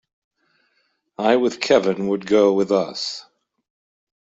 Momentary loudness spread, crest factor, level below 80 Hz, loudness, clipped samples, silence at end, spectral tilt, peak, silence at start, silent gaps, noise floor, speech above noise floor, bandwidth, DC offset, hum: 10 LU; 18 dB; -64 dBFS; -19 LUFS; under 0.1%; 1.1 s; -5 dB/octave; -4 dBFS; 1.2 s; none; -68 dBFS; 49 dB; 8 kHz; under 0.1%; none